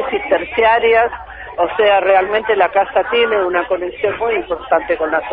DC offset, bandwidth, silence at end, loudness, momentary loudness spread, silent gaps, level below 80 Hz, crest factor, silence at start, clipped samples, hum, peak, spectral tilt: under 0.1%; 5 kHz; 0 s; -15 LUFS; 8 LU; none; -44 dBFS; 14 dB; 0 s; under 0.1%; none; 0 dBFS; -9 dB/octave